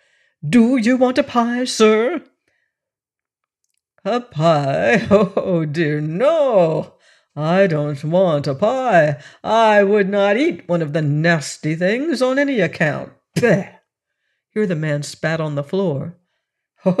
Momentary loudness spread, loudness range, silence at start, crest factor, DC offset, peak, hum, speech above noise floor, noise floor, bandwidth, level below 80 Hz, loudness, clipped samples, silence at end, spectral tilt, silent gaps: 9 LU; 5 LU; 0.45 s; 14 dB; under 0.1%; -4 dBFS; none; 71 dB; -88 dBFS; 12.5 kHz; -58 dBFS; -17 LUFS; under 0.1%; 0 s; -6 dB/octave; none